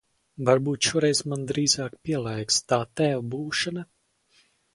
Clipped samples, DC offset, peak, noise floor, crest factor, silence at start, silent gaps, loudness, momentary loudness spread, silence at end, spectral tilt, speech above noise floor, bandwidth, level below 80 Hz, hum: under 0.1%; under 0.1%; -6 dBFS; -64 dBFS; 20 dB; 0.4 s; none; -25 LUFS; 7 LU; 0.9 s; -3.5 dB/octave; 39 dB; 11.5 kHz; -60 dBFS; none